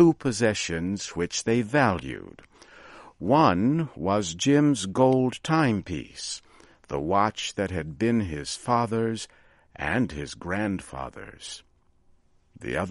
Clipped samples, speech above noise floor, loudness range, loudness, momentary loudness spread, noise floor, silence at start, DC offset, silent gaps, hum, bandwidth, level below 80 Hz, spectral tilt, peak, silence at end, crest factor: under 0.1%; 35 dB; 8 LU; -26 LUFS; 16 LU; -60 dBFS; 0 s; under 0.1%; none; none; 11.5 kHz; -52 dBFS; -5.5 dB/octave; -6 dBFS; 0 s; 20 dB